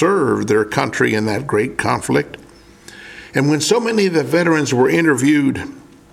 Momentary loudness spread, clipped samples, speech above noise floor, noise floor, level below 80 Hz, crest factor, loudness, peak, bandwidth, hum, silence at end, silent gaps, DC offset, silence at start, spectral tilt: 12 LU; under 0.1%; 26 dB; -42 dBFS; -52 dBFS; 16 dB; -16 LUFS; 0 dBFS; 15.5 kHz; none; 0.35 s; none; under 0.1%; 0 s; -5 dB/octave